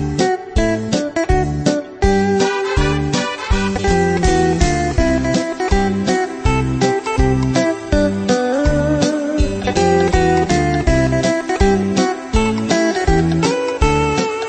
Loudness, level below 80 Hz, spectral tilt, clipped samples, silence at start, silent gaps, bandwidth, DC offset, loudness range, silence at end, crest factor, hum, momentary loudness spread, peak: -16 LUFS; -24 dBFS; -5.5 dB/octave; under 0.1%; 0 s; none; 8.8 kHz; under 0.1%; 1 LU; 0 s; 14 dB; none; 4 LU; -2 dBFS